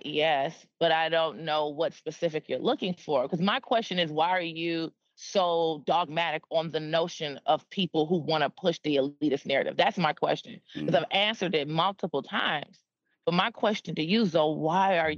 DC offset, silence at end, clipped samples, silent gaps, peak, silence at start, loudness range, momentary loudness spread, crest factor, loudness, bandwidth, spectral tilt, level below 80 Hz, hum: under 0.1%; 0 s; under 0.1%; none; -8 dBFS; 0.05 s; 1 LU; 7 LU; 20 dB; -28 LUFS; 7.4 kHz; -5.5 dB/octave; -76 dBFS; none